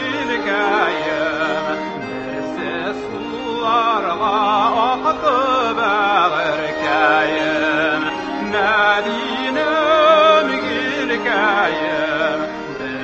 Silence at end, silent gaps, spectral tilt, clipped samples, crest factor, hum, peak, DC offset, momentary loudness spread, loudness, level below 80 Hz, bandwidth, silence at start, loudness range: 0 s; none; -4.5 dB/octave; under 0.1%; 16 dB; none; -2 dBFS; under 0.1%; 10 LU; -17 LUFS; -52 dBFS; 8 kHz; 0 s; 5 LU